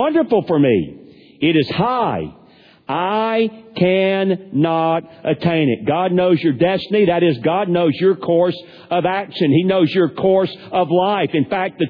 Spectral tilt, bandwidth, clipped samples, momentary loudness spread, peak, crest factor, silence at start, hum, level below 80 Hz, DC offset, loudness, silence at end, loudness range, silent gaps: -9.5 dB/octave; 5.2 kHz; under 0.1%; 6 LU; -2 dBFS; 14 dB; 0 s; none; -54 dBFS; under 0.1%; -17 LUFS; 0 s; 2 LU; none